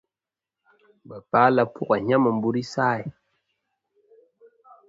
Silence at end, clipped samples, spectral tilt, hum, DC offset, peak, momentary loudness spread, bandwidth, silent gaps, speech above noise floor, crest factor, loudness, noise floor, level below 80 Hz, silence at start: 1.8 s; under 0.1%; -7 dB/octave; none; under 0.1%; -2 dBFS; 19 LU; 7.8 kHz; none; over 68 dB; 22 dB; -22 LUFS; under -90 dBFS; -66 dBFS; 1.1 s